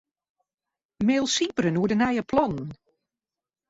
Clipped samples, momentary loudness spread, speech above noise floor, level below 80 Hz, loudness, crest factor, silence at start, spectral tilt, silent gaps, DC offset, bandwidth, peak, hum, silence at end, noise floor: under 0.1%; 7 LU; over 66 dB; -58 dBFS; -24 LUFS; 18 dB; 1 s; -4.5 dB/octave; none; under 0.1%; 8 kHz; -10 dBFS; none; 0.95 s; under -90 dBFS